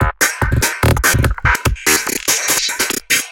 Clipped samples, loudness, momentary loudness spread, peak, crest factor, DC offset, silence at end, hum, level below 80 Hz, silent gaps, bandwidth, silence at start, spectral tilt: under 0.1%; -14 LUFS; 3 LU; 0 dBFS; 16 dB; under 0.1%; 0 s; none; -24 dBFS; none; 17.5 kHz; 0 s; -2.5 dB/octave